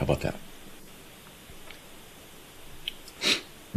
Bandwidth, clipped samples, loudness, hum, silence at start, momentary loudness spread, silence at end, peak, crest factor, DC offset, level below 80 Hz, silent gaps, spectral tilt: 15.5 kHz; under 0.1%; -30 LUFS; none; 0 s; 22 LU; 0 s; -10 dBFS; 24 dB; under 0.1%; -48 dBFS; none; -3.5 dB/octave